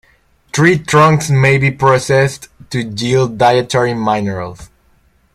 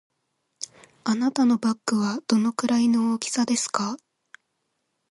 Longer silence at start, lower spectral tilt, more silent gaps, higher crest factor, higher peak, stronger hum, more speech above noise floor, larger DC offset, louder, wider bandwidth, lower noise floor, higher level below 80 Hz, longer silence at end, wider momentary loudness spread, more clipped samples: about the same, 0.55 s vs 0.6 s; first, -5.5 dB/octave vs -4 dB/octave; neither; about the same, 14 dB vs 18 dB; first, 0 dBFS vs -8 dBFS; neither; second, 41 dB vs 53 dB; neither; first, -13 LUFS vs -24 LUFS; first, 14 kHz vs 11.5 kHz; second, -53 dBFS vs -76 dBFS; first, -44 dBFS vs -72 dBFS; second, 0.7 s vs 1.15 s; second, 12 LU vs 17 LU; neither